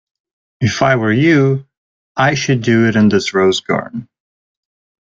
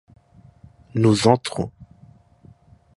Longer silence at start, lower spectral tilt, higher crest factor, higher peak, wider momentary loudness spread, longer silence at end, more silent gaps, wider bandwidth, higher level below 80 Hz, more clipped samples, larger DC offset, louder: second, 0.6 s vs 0.95 s; about the same, -6 dB/octave vs -6 dB/octave; second, 14 dB vs 22 dB; about the same, -2 dBFS vs -2 dBFS; second, 10 LU vs 14 LU; second, 0.95 s vs 1.15 s; first, 1.77-2.15 s vs none; second, 7.8 kHz vs 11.5 kHz; about the same, -50 dBFS vs -52 dBFS; neither; neither; first, -14 LUFS vs -20 LUFS